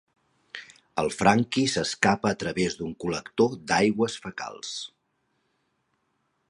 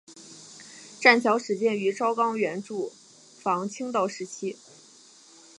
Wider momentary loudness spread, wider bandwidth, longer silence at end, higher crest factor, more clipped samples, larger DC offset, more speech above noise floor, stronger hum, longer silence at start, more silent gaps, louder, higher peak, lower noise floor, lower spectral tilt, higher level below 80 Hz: second, 16 LU vs 25 LU; about the same, 11.5 kHz vs 11.5 kHz; first, 1.65 s vs 1.05 s; about the same, 24 dB vs 24 dB; neither; neither; first, 48 dB vs 28 dB; neither; first, 0.55 s vs 0.1 s; neither; about the same, -26 LUFS vs -25 LUFS; about the same, -4 dBFS vs -4 dBFS; first, -74 dBFS vs -53 dBFS; about the same, -4.5 dB/octave vs -4 dB/octave; first, -58 dBFS vs -82 dBFS